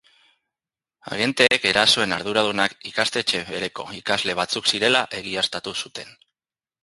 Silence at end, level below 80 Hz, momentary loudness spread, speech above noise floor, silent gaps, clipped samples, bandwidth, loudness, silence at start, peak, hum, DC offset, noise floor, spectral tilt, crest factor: 0.75 s; -60 dBFS; 13 LU; over 67 dB; none; under 0.1%; 11.5 kHz; -21 LUFS; 1.05 s; 0 dBFS; none; under 0.1%; under -90 dBFS; -2 dB/octave; 24 dB